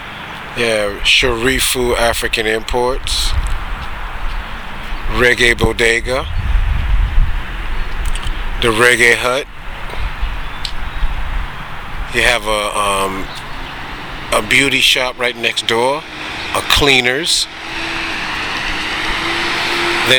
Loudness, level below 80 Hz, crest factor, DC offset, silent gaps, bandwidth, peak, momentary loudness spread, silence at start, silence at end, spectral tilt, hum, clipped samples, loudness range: -15 LUFS; -22 dBFS; 16 dB; under 0.1%; none; over 20 kHz; 0 dBFS; 16 LU; 0 s; 0 s; -3 dB/octave; none; under 0.1%; 5 LU